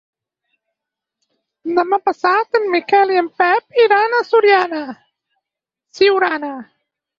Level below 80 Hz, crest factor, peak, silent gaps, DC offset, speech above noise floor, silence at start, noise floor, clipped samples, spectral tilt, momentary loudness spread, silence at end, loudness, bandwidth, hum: -66 dBFS; 16 dB; 0 dBFS; none; under 0.1%; 69 dB; 1.65 s; -84 dBFS; under 0.1%; -4 dB/octave; 13 LU; 0.55 s; -15 LUFS; 7.2 kHz; none